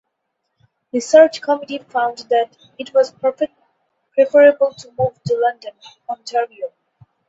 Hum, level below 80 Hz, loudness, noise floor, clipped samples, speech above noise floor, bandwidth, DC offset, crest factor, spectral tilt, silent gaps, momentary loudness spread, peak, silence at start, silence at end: none; -62 dBFS; -17 LUFS; -74 dBFS; under 0.1%; 57 dB; 8 kHz; under 0.1%; 18 dB; -5 dB/octave; none; 19 LU; 0 dBFS; 0.95 s; 0.6 s